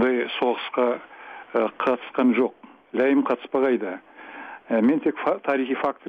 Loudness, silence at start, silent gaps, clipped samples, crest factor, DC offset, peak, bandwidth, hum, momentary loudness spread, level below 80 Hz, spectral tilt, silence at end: -24 LUFS; 0 s; none; under 0.1%; 14 dB; under 0.1%; -10 dBFS; 5 kHz; none; 18 LU; -70 dBFS; -7.5 dB/octave; 0 s